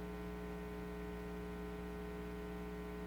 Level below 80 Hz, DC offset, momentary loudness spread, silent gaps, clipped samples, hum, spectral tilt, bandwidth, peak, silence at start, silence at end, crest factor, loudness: -52 dBFS; under 0.1%; 0 LU; none; under 0.1%; 60 Hz at -50 dBFS; -7 dB/octave; over 20 kHz; -36 dBFS; 0 s; 0 s; 10 dB; -47 LUFS